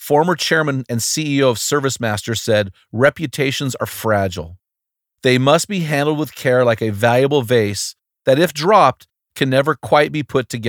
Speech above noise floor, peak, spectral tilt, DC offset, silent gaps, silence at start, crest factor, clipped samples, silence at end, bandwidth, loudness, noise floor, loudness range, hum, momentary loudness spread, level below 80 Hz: 66 dB; 0 dBFS; -4.5 dB/octave; under 0.1%; none; 0 s; 16 dB; under 0.1%; 0 s; 20 kHz; -17 LUFS; -83 dBFS; 3 LU; none; 8 LU; -54 dBFS